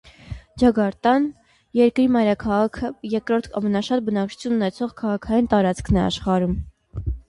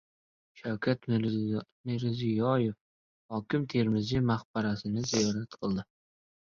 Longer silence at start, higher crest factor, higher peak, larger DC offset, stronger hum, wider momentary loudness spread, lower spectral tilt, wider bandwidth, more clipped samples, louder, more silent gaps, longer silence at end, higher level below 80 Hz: second, 0.25 s vs 0.55 s; about the same, 16 dB vs 18 dB; first, -6 dBFS vs -14 dBFS; neither; neither; about the same, 11 LU vs 9 LU; about the same, -7 dB/octave vs -6 dB/octave; first, 11.5 kHz vs 7.4 kHz; neither; first, -21 LUFS vs -31 LUFS; second, none vs 1.72-1.84 s, 2.81-3.29 s, 4.45-4.54 s; second, 0.1 s vs 0.75 s; first, -38 dBFS vs -60 dBFS